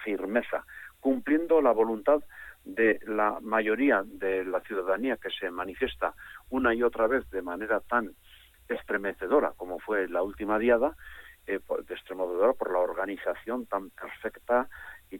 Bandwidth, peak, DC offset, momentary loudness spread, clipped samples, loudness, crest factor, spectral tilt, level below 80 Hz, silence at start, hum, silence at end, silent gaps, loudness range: 17.5 kHz; -12 dBFS; under 0.1%; 13 LU; under 0.1%; -29 LUFS; 18 dB; -6 dB/octave; -58 dBFS; 0 s; none; 0 s; none; 4 LU